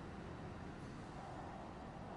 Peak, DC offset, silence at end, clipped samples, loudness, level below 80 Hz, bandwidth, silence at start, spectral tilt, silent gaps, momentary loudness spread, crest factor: -38 dBFS; under 0.1%; 0 s; under 0.1%; -51 LUFS; -62 dBFS; 11 kHz; 0 s; -6.5 dB/octave; none; 1 LU; 12 dB